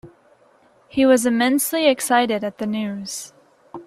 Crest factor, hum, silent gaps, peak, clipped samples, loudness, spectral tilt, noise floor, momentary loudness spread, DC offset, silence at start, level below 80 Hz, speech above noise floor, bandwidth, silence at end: 18 dB; none; none; -4 dBFS; under 0.1%; -19 LUFS; -3.5 dB/octave; -55 dBFS; 15 LU; under 0.1%; 0.05 s; -60 dBFS; 37 dB; 15.5 kHz; 0.05 s